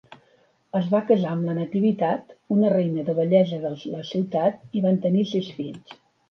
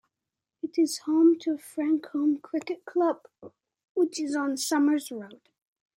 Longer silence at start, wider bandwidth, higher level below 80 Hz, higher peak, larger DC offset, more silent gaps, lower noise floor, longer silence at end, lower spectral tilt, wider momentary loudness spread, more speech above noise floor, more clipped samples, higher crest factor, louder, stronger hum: second, 0.1 s vs 0.65 s; second, 6.6 kHz vs 16.5 kHz; first, -70 dBFS vs -84 dBFS; first, -6 dBFS vs -12 dBFS; neither; second, none vs 3.84-3.95 s; second, -62 dBFS vs -88 dBFS; second, 0.35 s vs 0.6 s; first, -9 dB/octave vs -3 dB/octave; second, 10 LU vs 15 LU; second, 39 dB vs 61 dB; neither; about the same, 16 dB vs 16 dB; first, -23 LUFS vs -27 LUFS; neither